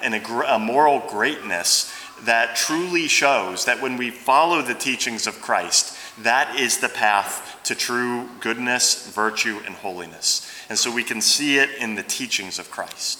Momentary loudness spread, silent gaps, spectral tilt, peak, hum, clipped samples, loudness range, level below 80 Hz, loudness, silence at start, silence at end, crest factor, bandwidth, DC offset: 10 LU; none; -1 dB/octave; -2 dBFS; none; under 0.1%; 3 LU; -70 dBFS; -20 LUFS; 0 s; 0 s; 20 dB; over 20 kHz; under 0.1%